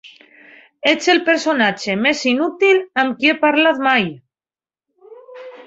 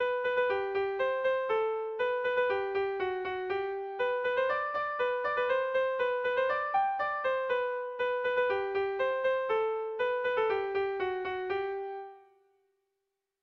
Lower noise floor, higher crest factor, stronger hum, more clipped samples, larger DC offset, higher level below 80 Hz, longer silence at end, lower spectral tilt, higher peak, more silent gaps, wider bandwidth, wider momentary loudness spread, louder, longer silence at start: first, under -90 dBFS vs -85 dBFS; first, 18 dB vs 12 dB; neither; neither; neither; about the same, -64 dBFS vs -68 dBFS; second, 0.05 s vs 1.25 s; second, -3.5 dB/octave vs -5 dB/octave; first, 0 dBFS vs -18 dBFS; neither; first, 8 kHz vs 6 kHz; about the same, 6 LU vs 5 LU; first, -16 LUFS vs -31 LUFS; about the same, 0.05 s vs 0 s